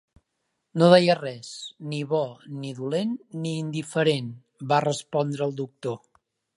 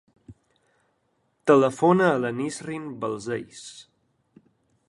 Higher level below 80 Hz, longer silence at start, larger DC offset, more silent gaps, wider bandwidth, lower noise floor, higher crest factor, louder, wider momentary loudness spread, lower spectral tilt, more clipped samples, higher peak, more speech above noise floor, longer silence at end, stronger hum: second, -72 dBFS vs -66 dBFS; first, 0.75 s vs 0.3 s; neither; neither; about the same, 11.5 kHz vs 11.5 kHz; first, -78 dBFS vs -71 dBFS; about the same, 24 dB vs 22 dB; about the same, -25 LUFS vs -23 LUFS; about the same, 19 LU vs 18 LU; about the same, -6 dB/octave vs -6 dB/octave; neither; about the same, -2 dBFS vs -4 dBFS; first, 53 dB vs 48 dB; second, 0.6 s vs 1.05 s; neither